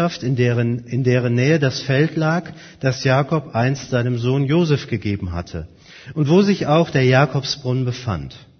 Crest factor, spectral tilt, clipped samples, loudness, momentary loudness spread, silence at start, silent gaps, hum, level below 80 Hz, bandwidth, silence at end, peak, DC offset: 18 dB; -6.5 dB/octave; under 0.1%; -19 LUFS; 11 LU; 0 s; none; none; -46 dBFS; 6.6 kHz; 0.2 s; 0 dBFS; under 0.1%